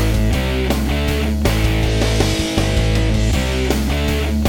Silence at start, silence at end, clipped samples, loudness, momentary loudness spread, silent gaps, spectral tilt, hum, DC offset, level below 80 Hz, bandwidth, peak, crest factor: 0 s; 0 s; under 0.1%; -18 LUFS; 2 LU; none; -5.5 dB/octave; none; under 0.1%; -20 dBFS; 19 kHz; 0 dBFS; 16 dB